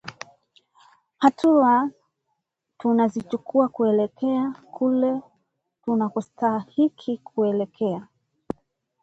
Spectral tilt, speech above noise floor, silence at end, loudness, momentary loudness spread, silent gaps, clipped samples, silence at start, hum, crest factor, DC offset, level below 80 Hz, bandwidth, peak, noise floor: -7.5 dB/octave; 56 dB; 1 s; -23 LUFS; 17 LU; none; under 0.1%; 0.05 s; none; 22 dB; under 0.1%; -66 dBFS; 8 kHz; -2 dBFS; -78 dBFS